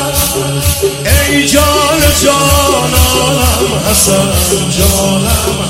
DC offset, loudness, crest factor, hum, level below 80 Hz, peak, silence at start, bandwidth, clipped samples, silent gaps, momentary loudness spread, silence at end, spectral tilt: under 0.1%; -9 LUFS; 10 dB; none; -18 dBFS; 0 dBFS; 0 s; 17 kHz; 0.2%; none; 4 LU; 0 s; -3.5 dB/octave